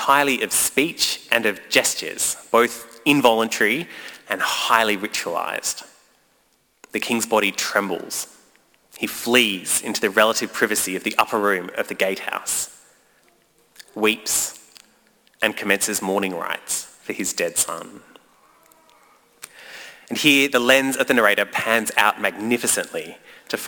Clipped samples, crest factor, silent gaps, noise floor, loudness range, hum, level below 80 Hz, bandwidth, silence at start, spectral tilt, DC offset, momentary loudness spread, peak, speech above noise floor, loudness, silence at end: under 0.1%; 22 dB; none; -63 dBFS; 7 LU; none; -64 dBFS; 19.5 kHz; 0 s; -1.5 dB/octave; under 0.1%; 13 LU; -2 dBFS; 42 dB; -20 LUFS; 0 s